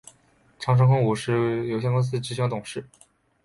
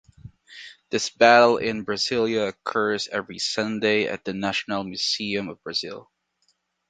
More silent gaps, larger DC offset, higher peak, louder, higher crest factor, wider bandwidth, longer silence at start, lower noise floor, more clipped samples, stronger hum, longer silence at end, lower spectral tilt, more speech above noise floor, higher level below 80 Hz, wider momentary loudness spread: neither; neither; second, -8 dBFS vs 0 dBFS; about the same, -24 LUFS vs -23 LUFS; second, 16 dB vs 24 dB; first, 11.5 kHz vs 9.4 kHz; first, 0.6 s vs 0.25 s; second, -60 dBFS vs -70 dBFS; neither; neither; second, 0.6 s vs 0.9 s; first, -7 dB/octave vs -3.5 dB/octave; second, 37 dB vs 47 dB; about the same, -58 dBFS vs -62 dBFS; about the same, 13 LU vs 13 LU